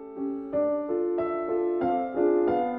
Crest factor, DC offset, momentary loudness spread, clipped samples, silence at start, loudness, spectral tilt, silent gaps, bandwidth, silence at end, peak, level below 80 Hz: 14 dB; under 0.1%; 6 LU; under 0.1%; 0 s; -27 LUFS; -10 dB/octave; none; 3.8 kHz; 0 s; -12 dBFS; -62 dBFS